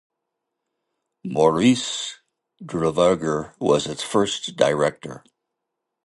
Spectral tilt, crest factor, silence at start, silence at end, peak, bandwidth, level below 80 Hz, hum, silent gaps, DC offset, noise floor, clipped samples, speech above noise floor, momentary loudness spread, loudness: -4.5 dB/octave; 20 dB; 1.25 s; 0.9 s; -2 dBFS; 11.5 kHz; -56 dBFS; none; none; under 0.1%; -81 dBFS; under 0.1%; 60 dB; 13 LU; -21 LUFS